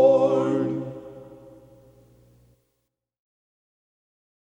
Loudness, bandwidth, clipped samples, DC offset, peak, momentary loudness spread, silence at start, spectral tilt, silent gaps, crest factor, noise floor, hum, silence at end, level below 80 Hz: -23 LUFS; 7.8 kHz; under 0.1%; under 0.1%; -6 dBFS; 25 LU; 0 s; -8.5 dB/octave; none; 20 dB; -78 dBFS; none; 3.1 s; -66 dBFS